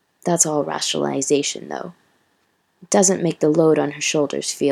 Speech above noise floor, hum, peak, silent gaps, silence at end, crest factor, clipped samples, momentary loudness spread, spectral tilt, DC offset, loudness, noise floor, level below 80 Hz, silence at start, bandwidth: 46 dB; none; 0 dBFS; none; 0 s; 20 dB; under 0.1%; 11 LU; -3.5 dB/octave; under 0.1%; -19 LUFS; -65 dBFS; -72 dBFS; 0.25 s; 14.5 kHz